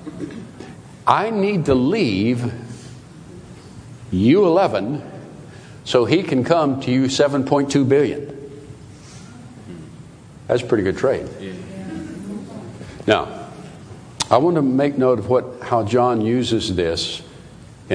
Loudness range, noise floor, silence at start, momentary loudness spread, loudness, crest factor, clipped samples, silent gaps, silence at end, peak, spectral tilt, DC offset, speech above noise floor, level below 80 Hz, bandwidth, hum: 6 LU; -41 dBFS; 0 s; 23 LU; -18 LUFS; 20 dB; under 0.1%; none; 0 s; 0 dBFS; -6 dB/octave; under 0.1%; 23 dB; -50 dBFS; 10.5 kHz; none